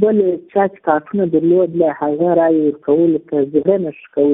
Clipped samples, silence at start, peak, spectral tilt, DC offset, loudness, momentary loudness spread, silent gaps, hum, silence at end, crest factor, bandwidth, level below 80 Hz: under 0.1%; 0 s; 0 dBFS; -13 dB/octave; under 0.1%; -16 LUFS; 4 LU; none; none; 0 s; 14 dB; 3.8 kHz; -58 dBFS